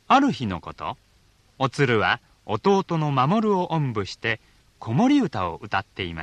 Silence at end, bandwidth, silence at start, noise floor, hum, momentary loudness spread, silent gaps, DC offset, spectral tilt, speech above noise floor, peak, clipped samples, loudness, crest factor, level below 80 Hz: 0 s; 10.5 kHz; 0.1 s; -59 dBFS; none; 12 LU; none; under 0.1%; -6.5 dB/octave; 37 dB; -6 dBFS; under 0.1%; -23 LUFS; 18 dB; -56 dBFS